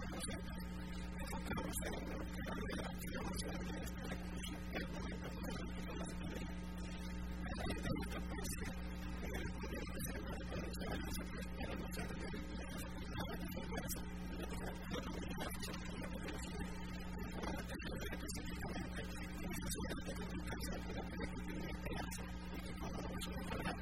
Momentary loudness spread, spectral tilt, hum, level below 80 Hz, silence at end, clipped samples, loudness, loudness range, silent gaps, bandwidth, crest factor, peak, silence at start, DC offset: 4 LU; -5 dB/octave; none; -50 dBFS; 0 s; under 0.1%; -46 LUFS; 1 LU; none; 16 kHz; 16 dB; -28 dBFS; 0 s; 0.2%